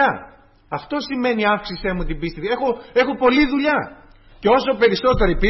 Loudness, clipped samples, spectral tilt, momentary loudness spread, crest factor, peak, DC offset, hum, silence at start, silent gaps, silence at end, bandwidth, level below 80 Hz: -19 LUFS; under 0.1%; -7 dB/octave; 10 LU; 14 dB; -4 dBFS; under 0.1%; none; 0 s; none; 0 s; 6 kHz; -32 dBFS